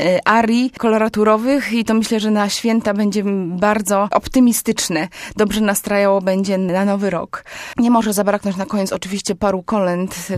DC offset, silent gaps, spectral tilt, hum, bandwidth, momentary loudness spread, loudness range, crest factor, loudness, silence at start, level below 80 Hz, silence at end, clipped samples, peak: under 0.1%; none; -4.5 dB/octave; none; 15.5 kHz; 7 LU; 2 LU; 16 dB; -17 LUFS; 0 s; -46 dBFS; 0 s; under 0.1%; 0 dBFS